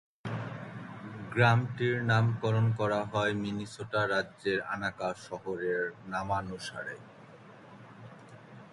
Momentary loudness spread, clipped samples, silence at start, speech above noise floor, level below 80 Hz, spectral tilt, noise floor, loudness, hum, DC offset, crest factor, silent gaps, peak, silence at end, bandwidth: 24 LU; under 0.1%; 0.25 s; 22 dB; -62 dBFS; -6.5 dB/octave; -52 dBFS; -31 LUFS; none; under 0.1%; 22 dB; none; -10 dBFS; 0 s; 11.5 kHz